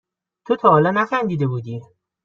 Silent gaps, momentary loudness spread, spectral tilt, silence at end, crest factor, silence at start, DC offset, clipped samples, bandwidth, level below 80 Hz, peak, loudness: none; 16 LU; -8.5 dB/octave; 0.4 s; 18 dB; 0.5 s; under 0.1%; under 0.1%; 7 kHz; -62 dBFS; -2 dBFS; -18 LUFS